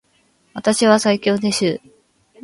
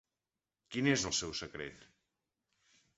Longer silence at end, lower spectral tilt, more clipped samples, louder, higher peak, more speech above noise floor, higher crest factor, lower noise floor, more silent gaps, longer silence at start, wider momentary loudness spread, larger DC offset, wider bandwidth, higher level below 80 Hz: second, 0.65 s vs 1.15 s; about the same, -4 dB/octave vs -3.5 dB/octave; neither; first, -17 LUFS vs -35 LUFS; first, 0 dBFS vs -16 dBFS; second, 43 dB vs over 54 dB; second, 18 dB vs 24 dB; second, -60 dBFS vs under -90 dBFS; neither; second, 0.55 s vs 0.7 s; about the same, 12 LU vs 14 LU; neither; first, 11.5 kHz vs 8 kHz; about the same, -60 dBFS vs -64 dBFS